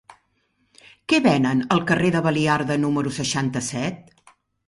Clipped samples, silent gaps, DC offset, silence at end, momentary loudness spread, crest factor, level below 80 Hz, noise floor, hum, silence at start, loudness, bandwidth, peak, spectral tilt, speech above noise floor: under 0.1%; none; under 0.1%; 0.65 s; 9 LU; 18 dB; -56 dBFS; -68 dBFS; none; 0.1 s; -21 LUFS; 11.5 kHz; -4 dBFS; -5 dB/octave; 47 dB